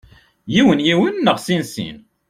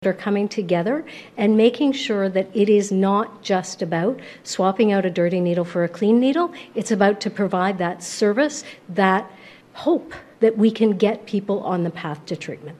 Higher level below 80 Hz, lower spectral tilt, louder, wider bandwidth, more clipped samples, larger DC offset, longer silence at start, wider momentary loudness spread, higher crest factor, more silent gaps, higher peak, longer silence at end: first, -52 dBFS vs -66 dBFS; about the same, -5.5 dB/octave vs -6 dB/octave; first, -16 LUFS vs -21 LUFS; first, 15.5 kHz vs 12 kHz; neither; neither; first, 0.45 s vs 0 s; first, 14 LU vs 11 LU; about the same, 16 dB vs 18 dB; neither; about the same, -2 dBFS vs -2 dBFS; first, 0.3 s vs 0.05 s